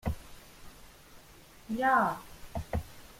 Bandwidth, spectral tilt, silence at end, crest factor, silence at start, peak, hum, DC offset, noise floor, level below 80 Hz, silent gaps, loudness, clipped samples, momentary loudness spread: 16.5 kHz; -6 dB/octave; 0.1 s; 22 dB; 0.05 s; -14 dBFS; none; under 0.1%; -55 dBFS; -48 dBFS; none; -32 LUFS; under 0.1%; 27 LU